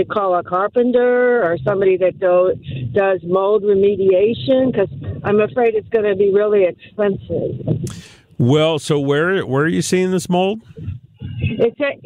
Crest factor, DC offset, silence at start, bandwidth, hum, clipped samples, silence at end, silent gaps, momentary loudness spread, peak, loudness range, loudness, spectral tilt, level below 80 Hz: 12 dB; under 0.1%; 0 s; 13.5 kHz; none; under 0.1%; 0 s; none; 9 LU; -4 dBFS; 2 LU; -17 LUFS; -6 dB/octave; -48 dBFS